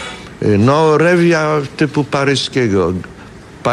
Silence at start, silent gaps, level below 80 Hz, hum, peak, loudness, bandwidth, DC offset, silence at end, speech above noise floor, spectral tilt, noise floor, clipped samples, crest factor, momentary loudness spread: 0 s; none; -44 dBFS; none; 0 dBFS; -14 LUFS; 12 kHz; under 0.1%; 0 s; 22 dB; -6 dB/octave; -35 dBFS; under 0.1%; 14 dB; 11 LU